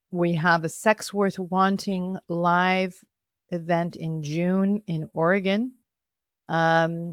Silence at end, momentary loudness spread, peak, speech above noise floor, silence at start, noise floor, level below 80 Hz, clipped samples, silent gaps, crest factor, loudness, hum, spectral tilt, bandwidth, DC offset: 0 s; 9 LU; -6 dBFS; 64 dB; 0.1 s; -88 dBFS; -68 dBFS; under 0.1%; none; 20 dB; -24 LUFS; none; -6 dB/octave; 15 kHz; under 0.1%